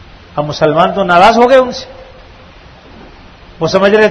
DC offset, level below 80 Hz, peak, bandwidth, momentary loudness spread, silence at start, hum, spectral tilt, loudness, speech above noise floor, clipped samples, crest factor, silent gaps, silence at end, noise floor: under 0.1%; -40 dBFS; 0 dBFS; 12 kHz; 16 LU; 0.35 s; none; -5.5 dB/octave; -9 LUFS; 28 dB; 0.9%; 12 dB; none; 0 s; -37 dBFS